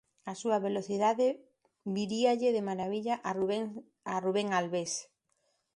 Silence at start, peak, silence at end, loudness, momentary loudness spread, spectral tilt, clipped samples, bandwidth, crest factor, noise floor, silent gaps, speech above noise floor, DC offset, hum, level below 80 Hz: 0.25 s; -16 dBFS; 0.75 s; -32 LUFS; 11 LU; -4.5 dB/octave; under 0.1%; 11.5 kHz; 18 dB; -77 dBFS; none; 46 dB; under 0.1%; none; -76 dBFS